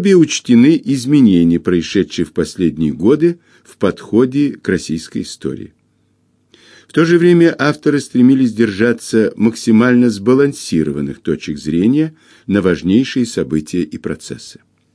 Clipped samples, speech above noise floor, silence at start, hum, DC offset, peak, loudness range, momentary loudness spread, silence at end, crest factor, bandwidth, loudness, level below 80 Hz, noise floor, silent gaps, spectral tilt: under 0.1%; 45 dB; 0 s; none; under 0.1%; 0 dBFS; 5 LU; 12 LU; 0.45 s; 14 dB; 11 kHz; -14 LUFS; -46 dBFS; -59 dBFS; none; -6 dB/octave